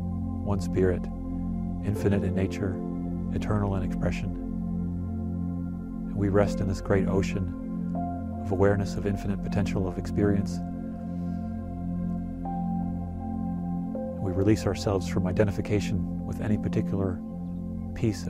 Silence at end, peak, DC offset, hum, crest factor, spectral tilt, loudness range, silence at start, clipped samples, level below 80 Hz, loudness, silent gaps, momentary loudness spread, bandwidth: 0 s; -10 dBFS; under 0.1%; none; 18 dB; -8 dB/octave; 3 LU; 0 s; under 0.1%; -42 dBFS; -29 LUFS; none; 9 LU; 12.5 kHz